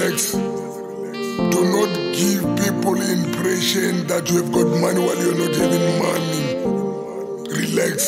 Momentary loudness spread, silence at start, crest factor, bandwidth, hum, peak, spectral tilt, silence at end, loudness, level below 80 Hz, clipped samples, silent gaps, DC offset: 9 LU; 0 s; 14 dB; 16.5 kHz; none; -4 dBFS; -4.5 dB/octave; 0 s; -20 LUFS; -54 dBFS; under 0.1%; none; under 0.1%